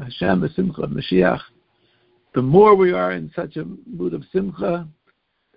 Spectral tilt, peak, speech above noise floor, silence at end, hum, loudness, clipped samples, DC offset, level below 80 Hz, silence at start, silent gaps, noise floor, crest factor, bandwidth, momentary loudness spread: -12 dB/octave; 0 dBFS; 48 dB; 0.65 s; none; -19 LUFS; under 0.1%; under 0.1%; -48 dBFS; 0 s; none; -66 dBFS; 20 dB; 5.2 kHz; 16 LU